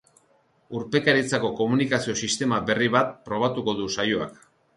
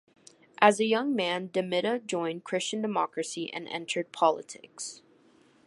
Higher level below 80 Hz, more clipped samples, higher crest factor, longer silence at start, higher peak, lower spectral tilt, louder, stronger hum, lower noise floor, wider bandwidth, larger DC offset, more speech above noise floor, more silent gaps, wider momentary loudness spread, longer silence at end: first, -60 dBFS vs -82 dBFS; neither; second, 20 dB vs 26 dB; about the same, 0.7 s vs 0.6 s; about the same, -6 dBFS vs -4 dBFS; about the same, -4 dB/octave vs -3.5 dB/octave; first, -24 LUFS vs -29 LUFS; neither; about the same, -63 dBFS vs -61 dBFS; about the same, 11.5 kHz vs 11.5 kHz; neither; first, 40 dB vs 32 dB; neither; second, 7 LU vs 14 LU; second, 0.45 s vs 0.7 s